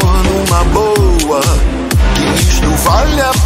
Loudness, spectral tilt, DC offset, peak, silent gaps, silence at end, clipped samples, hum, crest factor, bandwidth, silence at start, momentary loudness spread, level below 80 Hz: -11 LUFS; -4.5 dB/octave; under 0.1%; 0 dBFS; none; 0 s; under 0.1%; none; 10 dB; 16.5 kHz; 0 s; 2 LU; -14 dBFS